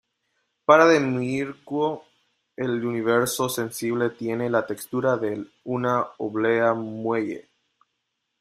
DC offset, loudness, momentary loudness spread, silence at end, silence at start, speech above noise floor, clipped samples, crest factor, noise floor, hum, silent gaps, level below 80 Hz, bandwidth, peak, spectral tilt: under 0.1%; -24 LUFS; 12 LU; 1 s; 0.7 s; 55 dB; under 0.1%; 22 dB; -78 dBFS; none; none; -66 dBFS; 15.5 kHz; -2 dBFS; -5 dB/octave